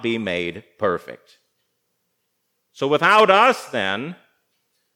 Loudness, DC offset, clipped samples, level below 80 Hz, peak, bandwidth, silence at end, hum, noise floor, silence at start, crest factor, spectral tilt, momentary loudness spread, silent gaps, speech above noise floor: -19 LUFS; under 0.1%; under 0.1%; -72 dBFS; 0 dBFS; 16.5 kHz; 0.8 s; 60 Hz at -60 dBFS; -73 dBFS; 0 s; 22 dB; -4.5 dB/octave; 16 LU; none; 53 dB